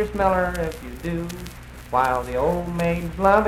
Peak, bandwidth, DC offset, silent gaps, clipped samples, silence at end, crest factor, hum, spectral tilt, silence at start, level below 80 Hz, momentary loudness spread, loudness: -4 dBFS; 16.5 kHz; under 0.1%; none; under 0.1%; 0 s; 20 dB; none; -6.5 dB/octave; 0 s; -36 dBFS; 12 LU; -23 LUFS